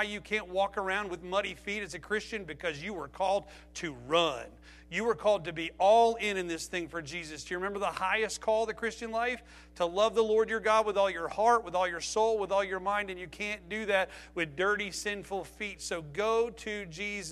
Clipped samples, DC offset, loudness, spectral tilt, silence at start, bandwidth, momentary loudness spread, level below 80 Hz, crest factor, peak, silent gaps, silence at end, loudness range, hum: under 0.1%; under 0.1%; -31 LUFS; -3.5 dB/octave; 0 s; 13.5 kHz; 11 LU; -58 dBFS; 18 dB; -12 dBFS; none; 0 s; 5 LU; none